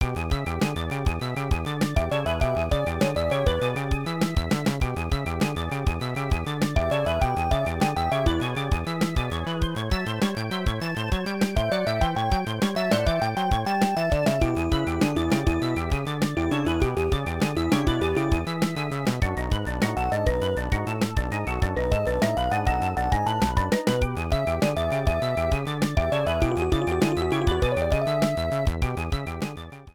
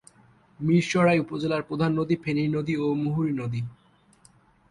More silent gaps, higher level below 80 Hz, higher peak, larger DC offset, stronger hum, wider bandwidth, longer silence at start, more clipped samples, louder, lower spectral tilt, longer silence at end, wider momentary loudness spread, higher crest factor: neither; first, -32 dBFS vs -60 dBFS; about the same, -8 dBFS vs -10 dBFS; first, 0.3% vs under 0.1%; neither; first, 19 kHz vs 11.5 kHz; second, 0 s vs 0.6 s; neither; about the same, -25 LUFS vs -25 LUFS; about the same, -6 dB/octave vs -7 dB/octave; second, 0.05 s vs 1 s; second, 4 LU vs 10 LU; about the same, 16 dB vs 16 dB